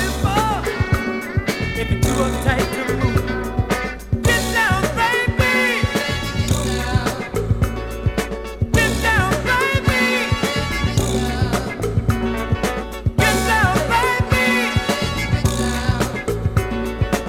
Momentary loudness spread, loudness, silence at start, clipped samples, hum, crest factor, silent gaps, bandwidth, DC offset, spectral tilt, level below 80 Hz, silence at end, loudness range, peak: 6 LU; -19 LUFS; 0 s; under 0.1%; none; 16 dB; none; 17.5 kHz; under 0.1%; -5 dB/octave; -28 dBFS; 0 s; 2 LU; -2 dBFS